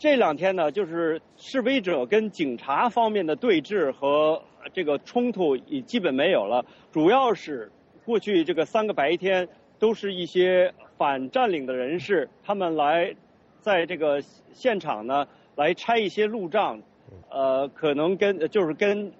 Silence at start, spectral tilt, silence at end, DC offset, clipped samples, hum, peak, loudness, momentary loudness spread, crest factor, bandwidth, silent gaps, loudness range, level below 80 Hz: 0 s; -3 dB/octave; 0.1 s; under 0.1%; under 0.1%; none; -8 dBFS; -25 LUFS; 8 LU; 16 dB; 7.8 kHz; none; 2 LU; -70 dBFS